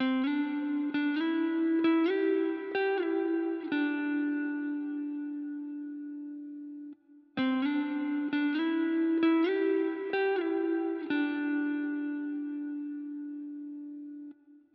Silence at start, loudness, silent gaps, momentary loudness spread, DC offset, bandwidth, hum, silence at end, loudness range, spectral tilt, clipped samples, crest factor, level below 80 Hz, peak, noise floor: 0 s; -31 LUFS; none; 15 LU; under 0.1%; 5 kHz; none; 0.15 s; 7 LU; -2.5 dB/octave; under 0.1%; 14 dB; -90 dBFS; -18 dBFS; -52 dBFS